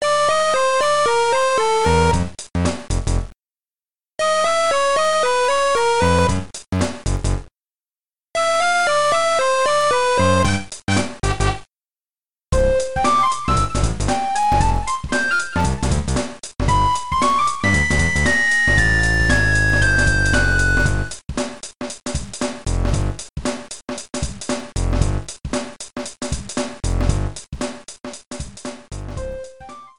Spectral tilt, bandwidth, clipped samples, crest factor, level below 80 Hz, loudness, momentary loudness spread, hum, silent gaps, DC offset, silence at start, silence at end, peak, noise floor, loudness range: -4.5 dB/octave; 12 kHz; under 0.1%; 16 dB; -28 dBFS; -19 LUFS; 14 LU; none; 3.39-3.43 s, 28.27-28.31 s; 2%; 0 s; 0 s; -4 dBFS; under -90 dBFS; 10 LU